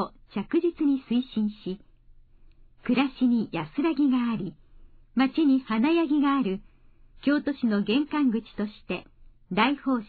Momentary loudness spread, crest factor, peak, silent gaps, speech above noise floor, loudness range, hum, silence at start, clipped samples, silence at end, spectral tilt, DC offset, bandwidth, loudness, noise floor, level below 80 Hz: 12 LU; 18 dB; -10 dBFS; none; 29 dB; 3 LU; none; 0 s; under 0.1%; 0.05 s; -9 dB/octave; under 0.1%; 4.8 kHz; -26 LUFS; -54 dBFS; -56 dBFS